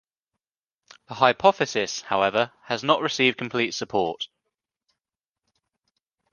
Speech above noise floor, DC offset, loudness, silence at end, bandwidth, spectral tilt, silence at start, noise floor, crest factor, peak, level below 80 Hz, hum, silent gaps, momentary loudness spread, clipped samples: 66 dB; under 0.1%; -23 LUFS; 2.05 s; 10 kHz; -3.5 dB/octave; 1.1 s; -90 dBFS; 24 dB; -2 dBFS; -66 dBFS; none; none; 9 LU; under 0.1%